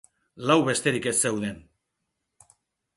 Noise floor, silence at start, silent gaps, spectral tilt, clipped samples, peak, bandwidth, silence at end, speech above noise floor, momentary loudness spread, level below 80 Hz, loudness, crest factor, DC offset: -80 dBFS; 0.35 s; none; -3.5 dB/octave; under 0.1%; -8 dBFS; 12 kHz; 1.35 s; 56 dB; 12 LU; -62 dBFS; -24 LUFS; 20 dB; under 0.1%